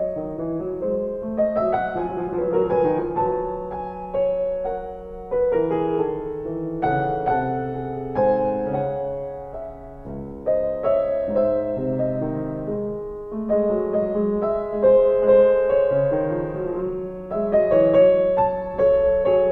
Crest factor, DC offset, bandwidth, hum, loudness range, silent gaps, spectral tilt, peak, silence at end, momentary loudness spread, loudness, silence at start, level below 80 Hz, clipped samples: 16 dB; 0.1%; 4 kHz; none; 5 LU; none; -10 dB/octave; -6 dBFS; 0 s; 13 LU; -22 LUFS; 0 s; -44 dBFS; under 0.1%